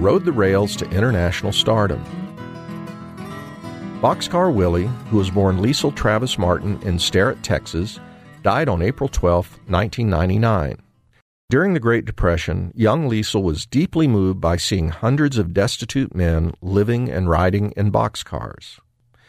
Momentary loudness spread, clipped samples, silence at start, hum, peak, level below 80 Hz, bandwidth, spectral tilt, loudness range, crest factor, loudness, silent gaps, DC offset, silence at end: 15 LU; under 0.1%; 0 s; none; -4 dBFS; -34 dBFS; 15 kHz; -6 dB/octave; 3 LU; 16 dB; -19 LUFS; 11.22-11.48 s; under 0.1%; 0.55 s